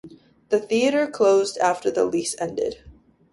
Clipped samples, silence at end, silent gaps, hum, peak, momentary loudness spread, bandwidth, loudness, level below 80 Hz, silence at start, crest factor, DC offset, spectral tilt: under 0.1%; 0.4 s; none; none; -6 dBFS; 9 LU; 11.5 kHz; -22 LUFS; -58 dBFS; 0.05 s; 16 dB; under 0.1%; -3.5 dB/octave